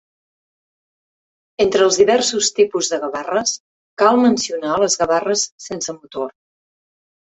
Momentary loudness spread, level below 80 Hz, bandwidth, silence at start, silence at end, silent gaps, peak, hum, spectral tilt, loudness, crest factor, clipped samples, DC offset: 14 LU; -58 dBFS; 8.4 kHz; 1.6 s; 1 s; 3.60-3.97 s, 5.52-5.58 s; -2 dBFS; none; -2.5 dB/octave; -17 LUFS; 18 dB; under 0.1%; under 0.1%